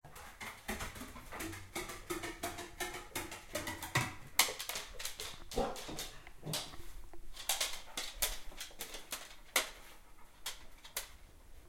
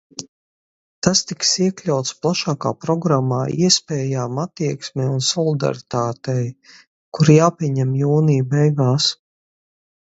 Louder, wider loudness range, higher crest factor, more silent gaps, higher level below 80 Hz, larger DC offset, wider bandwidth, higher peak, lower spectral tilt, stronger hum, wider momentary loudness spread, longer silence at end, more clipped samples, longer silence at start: second, -40 LUFS vs -18 LUFS; about the same, 5 LU vs 3 LU; first, 32 dB vs 20 dB; second, none vs 0.28-1.02 s, 6.87-7.12 s; about the same, -54 dBFS vs -58 dBFS; neither; first, 16.5 kHz vs 8 kHz; second, -10 dBFS vs 0 dBFS; second, -2 dB/octave vs -5 dB/octave; neither; first, 15 LU vs 8 LU; second, 0 s vs 0.95 s; neither; second, 0.05 s vs 0.2 s